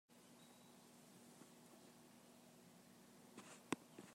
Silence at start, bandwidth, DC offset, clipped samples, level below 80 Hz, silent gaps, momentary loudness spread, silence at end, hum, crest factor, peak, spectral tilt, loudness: 0.1 s; 16 kHz; under 0.1%; under 0.1%; under -90 dBFS; none; 15 LU; 0 s; none; 34 dB; -26 dBFS; -3.5 dB/octave; -59 LUFS